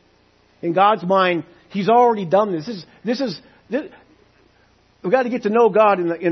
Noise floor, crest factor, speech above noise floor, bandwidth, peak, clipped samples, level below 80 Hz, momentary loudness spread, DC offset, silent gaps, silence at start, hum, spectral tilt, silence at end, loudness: -57 dBFS; 16 dB; 39 dB; 6.4 kHz; -4 dBFS; under 0.1%; -66 dBFS; 14 LU; under 0.1%; none; 0.65 s; none; -7 dB/octave; 0 s; -18 LUFS